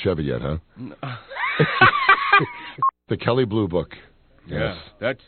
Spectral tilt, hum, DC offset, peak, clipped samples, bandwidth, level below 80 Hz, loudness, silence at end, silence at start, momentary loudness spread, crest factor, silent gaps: -3.5 dB/octave; none; under 0.1%; 0 dBFS; under 0.1%; 4.5 kHz; -46 dBFS; -20 LUFS; 0.1 s; 0 s; 18 LU; 22 dB; none